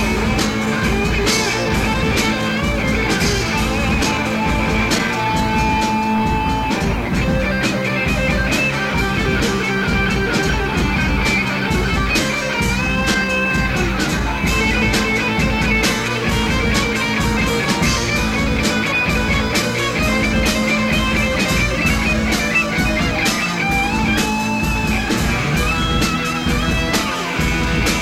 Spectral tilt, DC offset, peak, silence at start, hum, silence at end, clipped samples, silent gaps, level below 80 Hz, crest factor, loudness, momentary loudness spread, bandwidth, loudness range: -4.5 dB/octave; 0.1%; -2 dBFS; 0 s; none; 0 s; under 0.1%; none; -26 dBFS; 14 dB; -17 LUFS; 2 LU; 16.5 kHz; 1 LU